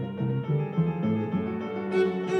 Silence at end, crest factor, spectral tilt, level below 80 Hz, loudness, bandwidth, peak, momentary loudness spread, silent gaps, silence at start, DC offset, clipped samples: 0 s; 14 dB; -9 dB/octave; -62 dBFS; -28 LUFS; 8.4 kHz; -14 dBFS; 4 LU; none; 0 s; under 0.1%; under 0.1%